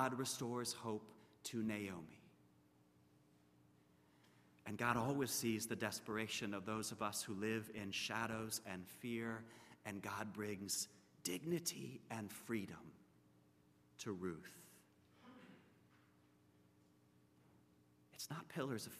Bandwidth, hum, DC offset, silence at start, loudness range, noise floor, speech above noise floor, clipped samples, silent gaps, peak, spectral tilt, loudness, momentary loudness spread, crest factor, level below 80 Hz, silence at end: 15 kHz; none; under 0.1%; 0 s; 12 LU; -72 dBFS; 27 dB; under 0.1%; none; -22 dBFS; -3.5 dB/octave; -45 LUFS; 18 LU; 24 dB; -82 dBFS; 0 s